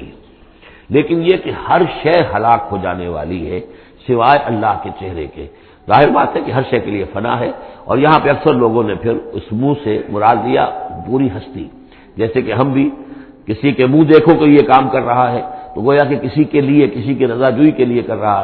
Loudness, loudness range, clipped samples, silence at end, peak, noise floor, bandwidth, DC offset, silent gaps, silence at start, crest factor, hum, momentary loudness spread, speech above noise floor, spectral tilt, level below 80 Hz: -14 LUFS; 5 LU; 0.1%; 0 s; 0 dBFS; -42 dBFS; 5.2 kHz; under 0.1%; none; 0 s; 14 dB; none; 15 LU; 29 dB; -10.5 dB/octave; -42 dBFS